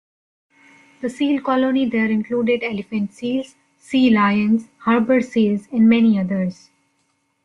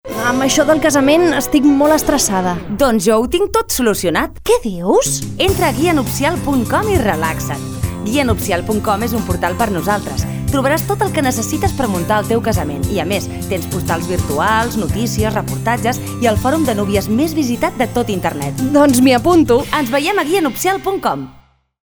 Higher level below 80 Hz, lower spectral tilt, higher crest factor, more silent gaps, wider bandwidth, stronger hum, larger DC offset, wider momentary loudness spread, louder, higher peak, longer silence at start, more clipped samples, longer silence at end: second, -60 dBFS vs -32 dBFS; first, -7 dB/octave vs -5 dB/octave; about the same, 14 dB vs 14 dB; neither; second, 9.8 kHz vs over 20 kHz; neither; neither; first, 10 LU vs 7 LU; second, -19 LUFS vs -15 LUFS; second, -4 dBFS vs 0 dBFS; first, 1 s vs 0.05 s; neither; first, 0.9 s vs 0.45 s